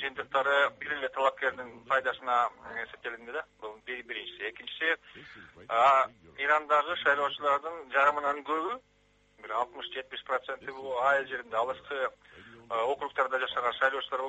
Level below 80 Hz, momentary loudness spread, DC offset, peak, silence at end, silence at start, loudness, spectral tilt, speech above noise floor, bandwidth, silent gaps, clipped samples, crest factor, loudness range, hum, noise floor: -70 dBFS; 14 LU; under 0.1%; -12 dBFS; 0 s; 0 s; -30 LUFS; -3 dB/octave; 33 dB; 8 kHz; none; under 0.1%; 20 dB; 6 LU; none; -63 dBFS